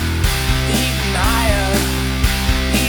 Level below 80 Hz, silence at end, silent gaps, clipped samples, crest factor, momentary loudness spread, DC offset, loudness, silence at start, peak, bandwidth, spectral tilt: -20 dBFS; 0 s; none; under 0.1%; 14 dB; 2 LU; under 0.1%; -17 LUFS; 0 s; -2 dBFS; over 20 kHz; -4 dB/octave